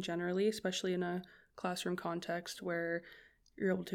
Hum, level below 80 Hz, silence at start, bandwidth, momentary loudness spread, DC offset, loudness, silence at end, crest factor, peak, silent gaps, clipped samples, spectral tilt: none; -74 dBFS; 0 s; 17 kHz; 8 LU; under 0.1%; -38 LUFS; 0 s; 16 dB; -22 dBFS; none; under 0.1%; -5 dB/octave